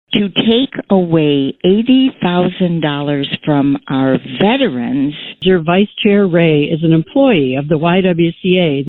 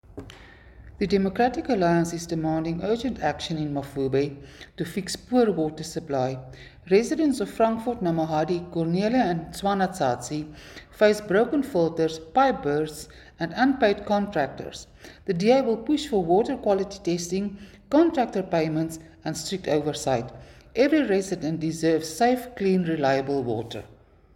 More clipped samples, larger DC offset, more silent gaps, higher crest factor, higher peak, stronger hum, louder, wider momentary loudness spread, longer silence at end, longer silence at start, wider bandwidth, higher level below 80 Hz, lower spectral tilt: neither; neither; neither; second, 12 dB vs 18 dB; first, 0 dBFS vs -6 dBFS; neither; first, -13 LUFS vs -25 LUFS; second, 5 LU vs 13 LU; second, 0 s vs 0.4 s; about the same, 0.1 s vs 0.1 s; second, 4.2 kHz vs 17 kHz; first, -46 dBFS vs -52 dBFS; first, -10 dB/octave vs -6 dB/octave